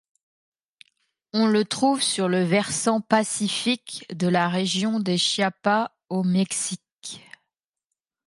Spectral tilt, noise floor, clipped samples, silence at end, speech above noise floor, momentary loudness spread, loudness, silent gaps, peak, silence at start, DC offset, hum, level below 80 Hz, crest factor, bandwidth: -4 dB/octave; -85 dBFS; under 0.1%; 1.1 s; 62 dB; 9 LU; -23 LUFS; 6.93-6.97 s; -2 dBFS; 1.35 s; under 0.1%; none; -70 dBFS; 22 dB; 11.5 kHz